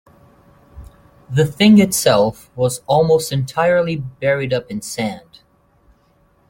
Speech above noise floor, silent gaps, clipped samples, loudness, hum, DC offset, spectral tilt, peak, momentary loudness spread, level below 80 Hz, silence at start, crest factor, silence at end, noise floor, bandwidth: 41 dB; none; under 0.1%; -16 LUFS; none; under 0.1%; -5 dB/octave; -2 dBFS; 12 LU; -48 dBFS; 0.75 s; 16 dB; 1.3 s; -57 dBFS; 17 kHz